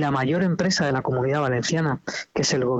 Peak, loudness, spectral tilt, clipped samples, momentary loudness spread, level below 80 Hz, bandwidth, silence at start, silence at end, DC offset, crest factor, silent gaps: -10 dBFS; -23 LUFS; -5 dB/octave; under 0.1%; 4 LU; -54 dBFS; 8.2 kHz; 0 s; 0 s; under 0.1%; 12 dB; none